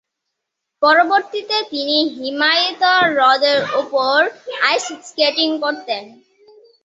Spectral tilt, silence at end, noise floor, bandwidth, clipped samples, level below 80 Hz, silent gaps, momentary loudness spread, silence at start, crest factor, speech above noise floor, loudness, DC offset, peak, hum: -2 dB/octave; 0.75 s; -78 dBFS; 8 kHz; under 0.1%; -70 dBFS; none; 8 LU; 0.8 s; 16 dB; 62 dB; -16 LUFS; under 0.1%; 0 dBFS; none